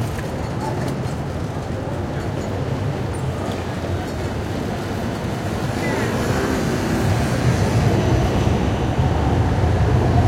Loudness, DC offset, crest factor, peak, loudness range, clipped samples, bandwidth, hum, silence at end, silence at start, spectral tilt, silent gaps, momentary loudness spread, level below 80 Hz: -21 LUFS; under 0.1%; 18 dB; -2 dBFS; 6 LU; under 0.1%; 16 kHz; none; 0 s; 0 s; -6.5 dB/octave; none; 7 LU; -30 dBFS